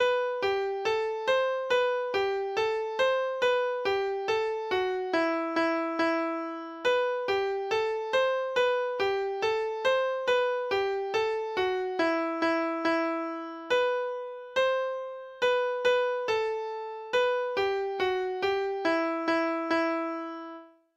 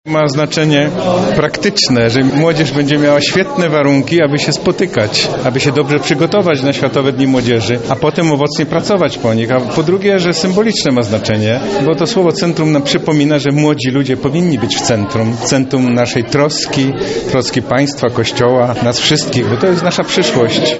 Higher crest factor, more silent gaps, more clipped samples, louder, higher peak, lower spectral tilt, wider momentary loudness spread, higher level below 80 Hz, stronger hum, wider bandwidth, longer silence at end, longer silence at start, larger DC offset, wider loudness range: about the same, 14 dB vs 12 dB; neither; neither; second, -28 LUFS vs -12 LUFS; second, -14 dBFS vs 0 dBFS; second, -3.5 dB/octave vs -5 dB/octave; about the same, 5 LU vs 3 LU; second, -68 dBFS vs -44 dBFS; neither; about the same, 8.4 kHz vs 8.2 kHz; first, 0.3 s vs 0 s; about the same, 0 s vs 0.05 s; second, under 0.1% vs 0.1%; about the same, 1 LU vs 2 LU